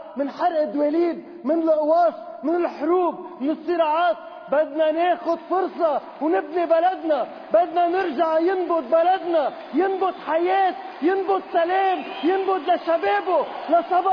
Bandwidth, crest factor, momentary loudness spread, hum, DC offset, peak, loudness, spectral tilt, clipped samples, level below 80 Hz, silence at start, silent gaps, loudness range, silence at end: 5.4 kHz; 14 dB; 5 LU; none; under 0.1%; -6 dBFS; -22 LUFS; -6 dB/octave; under 0.1%; -70 dBFS; 0 s; none; 1 LU; 0 s